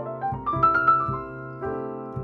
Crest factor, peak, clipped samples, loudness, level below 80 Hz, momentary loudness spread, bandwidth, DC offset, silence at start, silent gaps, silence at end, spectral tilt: 16 dB; -8 dBFS; under 0.1%; -24 LUFS; -48 dBFS; 14 LU; 5.8 kHz; under 0.1%; 0 s; none; 0 s; -9 dB/octave